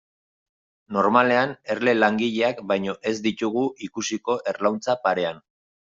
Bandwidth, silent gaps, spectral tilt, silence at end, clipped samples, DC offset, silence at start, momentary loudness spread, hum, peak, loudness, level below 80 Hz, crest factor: 7.8 kHz; none; -4.5 dB/octave; 0.5 s; under 0.1%; under 0.1%; 0.9 s; 9 LU; none; -2 dBFS; -23 LUFS; -66 dBFS; 20 dB